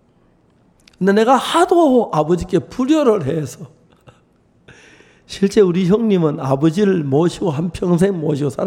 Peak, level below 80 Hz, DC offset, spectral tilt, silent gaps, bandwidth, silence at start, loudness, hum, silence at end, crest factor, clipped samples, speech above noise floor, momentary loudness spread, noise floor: -2 dBFS; -46 dBFS; under 0.1%; -7 dB/octave; none; 16.5 kHz; 1 s; -16 LUFS; none; 0 s; 16 dB; under 0.1%; 40 dB; 8 LU; -55 dBFS